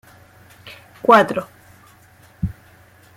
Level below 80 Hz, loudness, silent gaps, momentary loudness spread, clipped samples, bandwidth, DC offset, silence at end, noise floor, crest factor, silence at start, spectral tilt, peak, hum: -46 dBFS; -18 LUFS; none; 27 LU; under 0.1%; 16.5 kHz; under 0.1%; 0.65 s; -50 dBFS; 20 dB; 0.65 s; -6 dB/octave; -2 dBFS; none